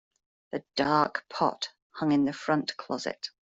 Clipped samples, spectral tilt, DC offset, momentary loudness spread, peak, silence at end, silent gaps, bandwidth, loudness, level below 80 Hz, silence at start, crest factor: under 0.1%; -5 dB/octave; under 0.1%; 12 LU; -10 dBFS; 0.2 s; 1.82-1.90 s; 8 kHz; -29 LUFS; -68 dBFS; 0.55 s; 20 dB